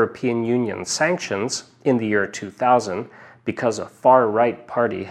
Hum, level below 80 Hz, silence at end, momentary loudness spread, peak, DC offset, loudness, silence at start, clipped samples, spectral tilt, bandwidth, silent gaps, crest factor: none; -66 dBFS; 0 s; 12 LU; -2 dBFS; under 0.1%; -21 LUFS; 0 s; under 0.1%; -4.5 dB/octave; 12.5 kHz; none; 18 dB